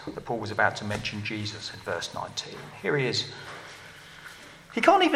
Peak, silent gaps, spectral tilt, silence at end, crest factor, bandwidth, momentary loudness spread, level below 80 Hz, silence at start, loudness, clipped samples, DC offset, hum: -4 dBFS; none; -4 dB/octave; 0 s; 24 dB; 15 kHz; 20 LU; -60 dBFS; 0 s; -28 LUFS; under 0.1%; under 0.1%; none